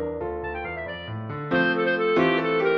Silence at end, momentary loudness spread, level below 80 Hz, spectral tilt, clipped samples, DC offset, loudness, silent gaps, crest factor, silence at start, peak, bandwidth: 0 s; 12 LU; -50 dBFS; -7.5 dB/octave; under 0.1%; under 0.1%; -25 LUFS; none; 14 dB; 0 s; -10 dBFS; 6.2 kHz